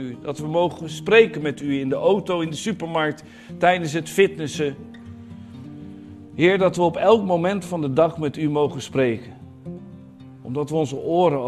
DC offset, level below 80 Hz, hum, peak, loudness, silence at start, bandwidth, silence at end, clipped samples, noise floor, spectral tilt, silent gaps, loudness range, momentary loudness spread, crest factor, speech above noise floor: under 0.1%; -58 dBFS; none; 0 dBFS; -21 LUFS; 0 s; 13.5 kHz; 0 s; under 0.1%; -42 dBFS; -6 dB/octave; none; 4 LU; 22 LU; 20 dB; 22 dB